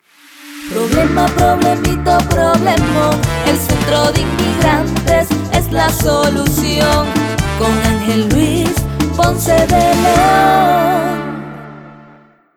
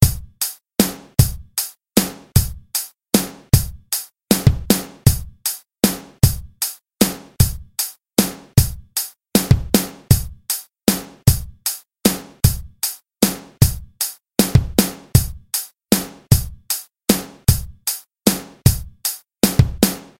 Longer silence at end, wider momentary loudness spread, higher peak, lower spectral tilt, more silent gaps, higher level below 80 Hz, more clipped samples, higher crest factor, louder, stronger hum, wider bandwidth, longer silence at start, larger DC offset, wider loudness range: first, 0.55 s vs 0.15 s; about the same, 7 LU vs 8 LU; about the same, -2 dBFS vs 0 dBFS; about the same, -5 dB/octave vs -4.5 dB/octave; neither; about the same, -26 dBFS vs -30 dBFS; neither; second, 10 dB vs 20 dB; first, -13 LUFS vs -19 LUFS; neither; first, over 20 kHz vs 17.5 kHz; first, 0.4 s vs 0 s; neither; about the same, 2 LU vs 1 LU